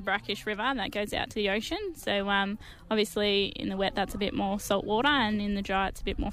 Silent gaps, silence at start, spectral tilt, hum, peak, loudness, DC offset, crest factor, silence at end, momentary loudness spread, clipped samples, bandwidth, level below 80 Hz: none; 0 s; -4.5 dB/octave; none; -12 dBFS; -29 LUFS; under 0.1%; 18 dB; 0 s; 6 LU; under 0.1%; 15.5 kHz; -46 dBFS